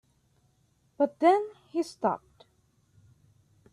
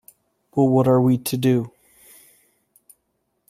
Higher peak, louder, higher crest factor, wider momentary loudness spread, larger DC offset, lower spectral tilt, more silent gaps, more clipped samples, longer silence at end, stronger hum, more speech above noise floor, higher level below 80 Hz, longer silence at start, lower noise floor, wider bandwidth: second, -10 dBFS vs -6 dBFS; second, -28 LUFS vs -19 LUFS; about the same, 22 dB vs 18 dB; about the same, 11 LU vs 10 LU; neither; second, -5.5 dB/octave vs -7 dB/octave; neither; neither; second, 1.55 s vs 1.8 s; neither; second, 43 dB vs 55 dB; second, -74 dBFS vs -60 dBFS; first, 1 s vs 0.55 s; about the same, -69 dBFS vs -72 dBFS; second, 12.5 kHz vs 15.5 kHz